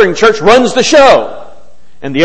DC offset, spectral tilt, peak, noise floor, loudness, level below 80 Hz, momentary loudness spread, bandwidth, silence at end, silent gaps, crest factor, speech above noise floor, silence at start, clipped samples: 6%; -3.5 dB/octave; 0 dBFS; -43 dBFS; -7 LUFS; -38 dBFS; 17 LU; 11 kHz; 0 s; none; 8 dB; 36 dB; 0 s; 2%